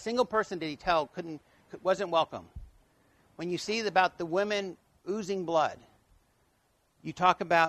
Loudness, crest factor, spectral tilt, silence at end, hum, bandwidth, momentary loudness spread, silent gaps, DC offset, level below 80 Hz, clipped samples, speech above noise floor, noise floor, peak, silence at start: -30 LUFS; 22 dB; -4.5 dB/octave; 0 s; none; 13 kHz; 18 LU; none; under 0.1%; -60 dBFS; under 0.1%; 41 dB; -71 dBFS; -8 dBFS; 0 s